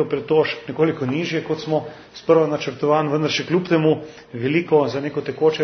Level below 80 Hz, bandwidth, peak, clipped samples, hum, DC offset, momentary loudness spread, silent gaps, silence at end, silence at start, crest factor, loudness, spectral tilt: -62 dBFS; 6.4 kHz; -2 dBFS; under 0.1%; none; under 0.1%; 8 LU; none; 0 s; 0 s; 18 dB; -20 LUFS; -6.5 dB/octave